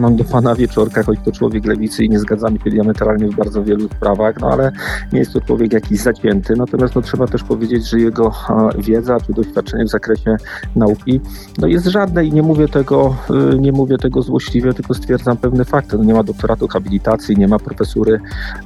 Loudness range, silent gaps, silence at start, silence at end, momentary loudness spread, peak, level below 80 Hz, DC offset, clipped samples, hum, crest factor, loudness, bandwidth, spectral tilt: 2 LU; none; 0 s; 0 s; 5 LU; 0 dBFS; -28 dBFS; under 0.1%; under 0.1%; none; 14 dB; -15 LUFS; 12.5 kHz; -7.5 dB/octave